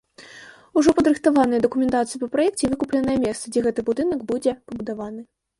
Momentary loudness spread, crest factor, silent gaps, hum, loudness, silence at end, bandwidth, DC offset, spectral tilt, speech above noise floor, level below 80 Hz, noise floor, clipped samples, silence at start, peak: 14 LU; 16 dB; none; none; -22 LUFS; 0.35 s; 11.5 kHz; under 0.1%; -5 dB/octave; 24 dB; -52 dBFS; -45 dBFS; under 0.1%; 0.2 s; -6 dBFS